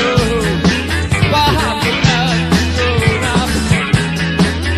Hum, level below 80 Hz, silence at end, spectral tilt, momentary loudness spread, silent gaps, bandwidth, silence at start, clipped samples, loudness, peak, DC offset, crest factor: none; -26 dBFS; 0 s; -5 dB/octave; 3 LU; none; 14.5 kHz; 0 s; under 0.1%; -14 LUFS; 0 dBFS; under 0.1%; 14 dB